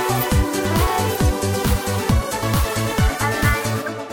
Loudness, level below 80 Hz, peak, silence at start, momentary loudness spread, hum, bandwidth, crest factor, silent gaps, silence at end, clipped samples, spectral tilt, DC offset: -20 LUFS; -26 dBFS; -4 dBFS; 0 s; 2 LU; none; 17 kHz; 14 dB; none; 0 s; under 0.1%; -5 dB/octave; under 0.1%